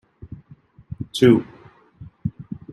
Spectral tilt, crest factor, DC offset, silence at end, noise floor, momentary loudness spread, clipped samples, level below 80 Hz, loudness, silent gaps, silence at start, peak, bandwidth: -7 dB/octave; 22 dB; under 0.1%; 0.2 s; -50 dBFS; 26 LU; under 0.1%; -52 dBFS; -20 LUFS; none; 0.25 s; -2 dBFS; 12.5 kHz